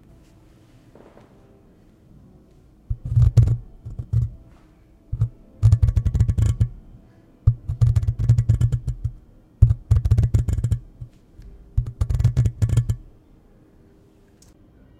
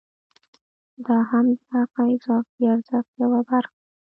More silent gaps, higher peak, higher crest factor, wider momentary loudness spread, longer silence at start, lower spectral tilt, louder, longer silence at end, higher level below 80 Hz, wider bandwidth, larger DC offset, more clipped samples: second, none vs 2.49-2.58 s, 3.08-3.13 s; first, 0 dBFS vs -8 dBFS; first, 22 dB vs 16 dB; first, 14 LU vs 5 LU; first, 2.9 s vs 1 s; about the same, -8.5 dB/octave vs -9.5 dB/octave; about the same, -22 LUFS vs -22 LUFS; first, 1.95 s vs 0.5 s; first, -28 dBFS vs -76 dBFS; first, 9.6 kHz vs 4.5 kHz; neither; neither